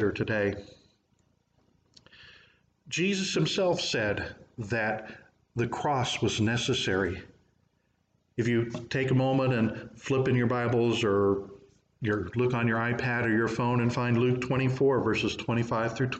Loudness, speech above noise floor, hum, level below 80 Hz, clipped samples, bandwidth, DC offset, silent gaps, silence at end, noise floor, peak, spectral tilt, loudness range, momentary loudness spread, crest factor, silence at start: -28 LUFS; 45 dB; none; -60 dBFS; under 0.1%; 8.8 kHz; under 0.1%; none; 0 s; -72 dBFS; -14 dBFS; -5.5 dB/octave; 4 LU; 8 LU; 14 dB; 0 s